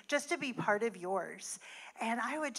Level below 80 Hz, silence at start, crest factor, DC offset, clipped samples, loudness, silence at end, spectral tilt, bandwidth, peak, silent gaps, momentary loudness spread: under -90 dBFS; 0.1 s; 20 dB; under 0.1%; under 0.1%; -36 LUFS; 0 s; -3.5 dB/octave; 15 kHz; -18 dBFS; none; 10 LU